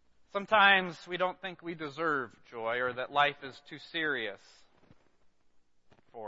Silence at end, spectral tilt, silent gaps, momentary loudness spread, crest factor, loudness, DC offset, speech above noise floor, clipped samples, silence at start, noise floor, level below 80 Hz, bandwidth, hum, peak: 0 s; -4.5 dB/octave; none; 18 LU; 24 dB; -30 LUFS; under 0.1%; 32 dB; under 0.1%; 0.35 s; -64 dBFS; -74 dBFS; 8 kHz; none; -10 dBFS